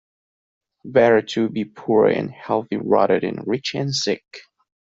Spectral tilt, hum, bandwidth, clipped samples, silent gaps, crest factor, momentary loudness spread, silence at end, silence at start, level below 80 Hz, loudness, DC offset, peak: -5 dB/octave; none; 7.8 kHz; under 0.1%; none; 18 dB; 8 LU; 0.4 s; 0.85 s; -60 dBFS; -20 LUFS; under 0.1%; -2 dBFS